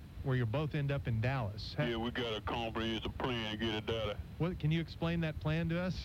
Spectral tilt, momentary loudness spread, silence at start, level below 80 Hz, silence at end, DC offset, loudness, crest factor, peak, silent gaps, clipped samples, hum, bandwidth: -7 dB/octave; 3 LU; 0 s; -50 dBFS; 0 s; under 0.1%; -36 LUFS; 14 dB; -22 dBFS; none; under 0.1%; none; 15.5 kHz